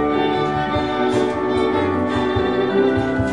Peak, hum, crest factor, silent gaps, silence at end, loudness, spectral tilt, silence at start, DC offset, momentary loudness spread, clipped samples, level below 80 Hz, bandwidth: -6 dBFS; none; 12 dB; none; 0 s; -19 LUFS; -7 dB/octave; 0 s; 0.4%; 2 LU; under 0.1%; -40 dBFS; 10.5 kHz